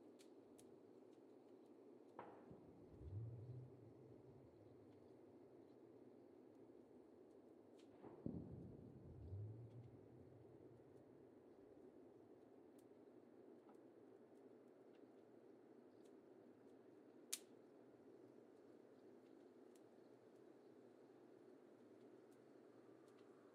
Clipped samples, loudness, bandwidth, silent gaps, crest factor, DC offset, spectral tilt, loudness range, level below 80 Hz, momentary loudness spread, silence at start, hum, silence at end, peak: under 0.1%; -63 LUFS; 8.4 kHz; none; 34 dB; under 0.1%; -5.5 dB/octave; 8 LU; -80 dBFS; 12 LU; 0 s; none; 0 s; -28 dBFS